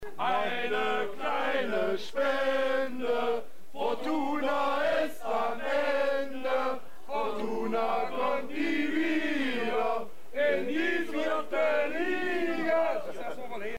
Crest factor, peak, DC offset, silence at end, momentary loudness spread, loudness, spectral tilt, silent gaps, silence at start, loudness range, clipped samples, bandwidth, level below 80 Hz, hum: 12 dB; -16 dBFS; 2%; 0 s; 6 LU; -30 LUFS; -4.5 dB/octave; none; 0 s; 1 LU; under 0.1%; 16 kHz; -66 dBFS; none